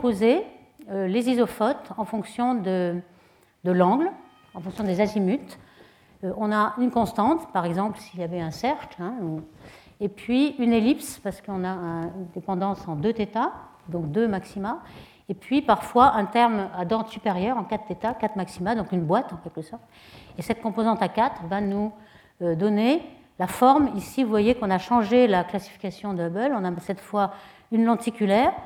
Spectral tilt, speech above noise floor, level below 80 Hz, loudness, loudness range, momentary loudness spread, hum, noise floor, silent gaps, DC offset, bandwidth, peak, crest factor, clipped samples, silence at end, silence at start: -6.5 dB/octave; 34 dB; -56 dBFS; -25 LUFS; 6 LU; 13 LU; none; -58 dBFS; none; under 0.1%; 16.5 kHz; -4 dBFS; 20 dB; under 0.1%; 0 s; 0 s